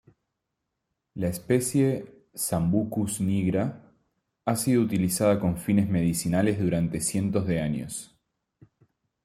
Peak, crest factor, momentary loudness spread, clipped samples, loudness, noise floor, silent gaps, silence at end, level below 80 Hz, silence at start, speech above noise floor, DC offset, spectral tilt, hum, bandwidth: -10 dBFS; 18 dB; 9 LU; under 0.1%; -26 LUFS; -82 dBFS; none; 1.2 s; -56 dBFS; 1.15 s; 57 dB; under 0.1%; -6 dB/octave; none; 15.5 kHz